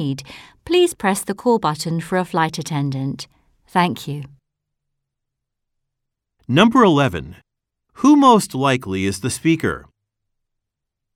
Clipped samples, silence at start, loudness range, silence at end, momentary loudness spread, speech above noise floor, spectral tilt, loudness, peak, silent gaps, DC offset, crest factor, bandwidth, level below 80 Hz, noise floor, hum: under 0.1%; 0 s; 10 LU; 1.35 s; 18 LU; 63 dB; -5.5 dB/octave; -18 LUFS; 0 dBFS; none; under 0.1%; 20 dB; 16.5 kHz; -52 dBFS; -80 dBFS; none